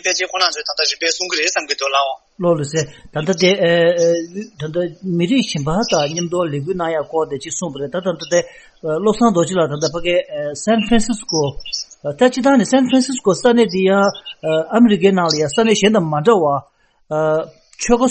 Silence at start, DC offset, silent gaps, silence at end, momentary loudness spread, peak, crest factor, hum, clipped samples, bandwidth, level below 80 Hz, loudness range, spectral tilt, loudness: 0.05 s; under 0.1%; none; 0 s; 10 LU; 0 dBFS; 16 dB; none; under 0.1%; 8.8 kHz; -44 dBFS; 5 LU; -4.5 dB/octave; -17 LUFS